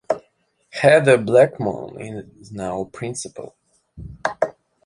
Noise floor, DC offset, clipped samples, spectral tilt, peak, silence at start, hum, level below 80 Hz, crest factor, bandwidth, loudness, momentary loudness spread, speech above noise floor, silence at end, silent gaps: -64 dBFS; under 0.1%; under 0.1%; -5.5 dB/octave; 0 dBFS; 0.1 s; none; -52 dBFS; 20 dB; 11.5 kHz; -19 LUFS; 23 LU; 45 dB; 0.35 s; none